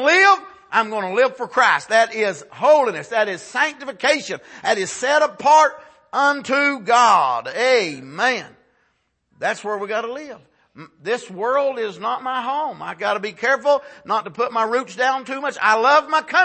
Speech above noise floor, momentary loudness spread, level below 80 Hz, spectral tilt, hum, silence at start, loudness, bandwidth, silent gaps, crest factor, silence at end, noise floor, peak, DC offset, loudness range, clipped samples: 48 dB; 11 LU; -72 dBFS; -2.5 dB/octave; none; 0 s; -19 LUFS; 8.8 kHz; none; 16 dB; 0 s; -67 dBFS; -2 dBFS; under 0.1%; 8 LU; under 0.1%